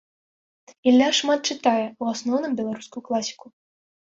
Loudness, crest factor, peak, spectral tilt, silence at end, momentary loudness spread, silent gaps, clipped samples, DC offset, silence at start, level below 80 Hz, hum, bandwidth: -23 LUFS; 18 dB; -6 dBFS; -3 dB/octave; 0.8 s; 11 LU; none; under 0.1%; under 0.1%; 0.85 s; -70 dBFS; none; 7.8 kHz